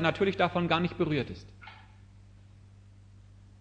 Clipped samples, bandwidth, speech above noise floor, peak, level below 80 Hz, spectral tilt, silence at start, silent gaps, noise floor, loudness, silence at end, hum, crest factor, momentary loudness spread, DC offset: under 0.1%; 8.4 kHz; 25 dB; -10 dBFS; -56 dBFS; -7 dB/octave; 0 s; none; -54 dBFS; -29 LUFS; 0.4 s; 50 Hz at -60 dBFS; 22 dB; 22 LU; under 0.1%